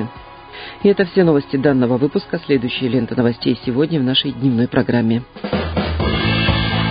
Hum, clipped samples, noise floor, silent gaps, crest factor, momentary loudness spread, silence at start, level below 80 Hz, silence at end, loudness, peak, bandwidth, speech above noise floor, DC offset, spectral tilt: none; under 0.1%; -36 dBFS; none; 16 dB; 7 LU; 0 s; -32 dBFS; 0 s; -17 LUFS; 0 dBFS; 5.2 kHz; 20 dB; under 0.1%; -12 dB/octave